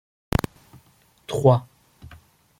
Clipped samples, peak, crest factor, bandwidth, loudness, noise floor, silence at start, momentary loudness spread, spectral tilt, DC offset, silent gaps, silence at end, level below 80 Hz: under 0.1%; -2 dBFS; 24 dB; 16.5 kHz; -23 LUFS; -58 dBFS; 1.3 s; 17 LU; -7 dB/octave; under 0.1%; none; 0.95 s; -44 dBFS